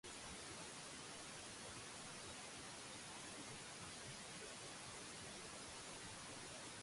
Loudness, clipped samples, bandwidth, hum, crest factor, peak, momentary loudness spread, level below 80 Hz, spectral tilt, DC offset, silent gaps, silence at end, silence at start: -52 LUFS; under 0.1%; 11.5 kHz; none; 12 dB; -42 dBFS; 0 LU; -74 dBFS; -2 dB/octave; under 0.1%; none; 0 s; 0.05 s